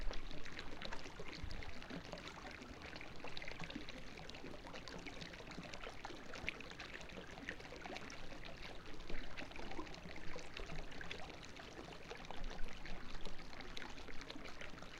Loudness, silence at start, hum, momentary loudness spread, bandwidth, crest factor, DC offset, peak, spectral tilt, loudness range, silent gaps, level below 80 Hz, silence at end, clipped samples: -51 LUFS; 0 s; none; 3 LU; 10.5 kHz; 22 dB; under 0.1%; -22 dBFS; -4 dB/octave; 2 LU; none; -52 dBFS; 0 s; under 0.1%